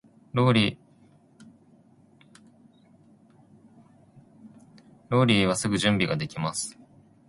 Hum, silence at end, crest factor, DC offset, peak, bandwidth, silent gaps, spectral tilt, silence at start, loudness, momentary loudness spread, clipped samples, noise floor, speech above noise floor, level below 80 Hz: none; 0.55 s; 22 dB; under 0.1%; -6 dBFS; 11.5 kHz; none; -5 dB/octave; 0.35 s; -24 LUFS; 11 LU; under 0.1%; -58 dBFS; 34 dB; -58 dBFS